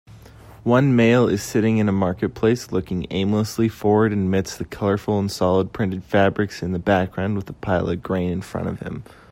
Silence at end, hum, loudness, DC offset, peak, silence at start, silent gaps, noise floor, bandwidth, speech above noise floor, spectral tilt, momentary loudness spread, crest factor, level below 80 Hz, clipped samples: 0.3 s; none; -21 LUFS; under 0.1%; -4 dBFS; 0.1 s; none; -44 dBFS; 16 kHz; 23 dB; -6.5 dB/octave; 10 LU; 16 dB; -48 dBFS; under 0.1%